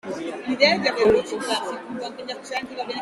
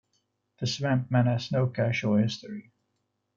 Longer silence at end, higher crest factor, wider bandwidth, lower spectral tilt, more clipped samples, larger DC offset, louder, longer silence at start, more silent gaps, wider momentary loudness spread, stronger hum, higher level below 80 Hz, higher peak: second, 0 s vs 0.75 s; first, 22 dB vs 16 dB; first, 12.5 kHz vs 7.4 kHz; second, -3.5 dB/octave vs -6.5 dB/octave; neither; neither; first, -23 LUFS vs -27 LUFS; second, 0.05 s vs 0.6 s; neither; about the same, 14 LU vs 12 LU; neither; first, -56 dBFS vs -66 dBFS; first, -2 dBFS vs -12 dBFS